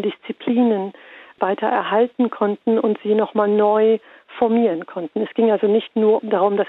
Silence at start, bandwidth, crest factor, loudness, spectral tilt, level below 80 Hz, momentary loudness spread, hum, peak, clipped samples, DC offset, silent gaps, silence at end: 0 s; 4.1 kHz; 14 dB; -19 LUFS; -9.5 dB/octave; -72 dBFS; 9 LU; none; -6 dBFS; under 0.1%; under 0.1%; none; 0 s